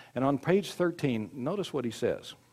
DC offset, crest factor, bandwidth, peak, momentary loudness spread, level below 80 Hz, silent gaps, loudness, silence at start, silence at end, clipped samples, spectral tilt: under 0.1%; 18 dB; 15.5 kHz; -12 dBFS; 7 LU; -66 dBFS; none; -31 LUFS; 0 s; 0.2 s; under 0.1%; -6.5 dB/octave